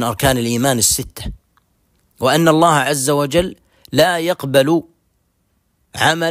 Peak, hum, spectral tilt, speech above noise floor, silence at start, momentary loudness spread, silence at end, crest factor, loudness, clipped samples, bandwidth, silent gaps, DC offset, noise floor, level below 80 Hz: 0 dBFS; none; -4 dB/octave; 49 dB; 0 s; 11 LU; 0 s; 16 dB; -15 LUFS; under 0.1%; 16 kHz; none; under 0.1%; -64 dBFS; -40 dBFS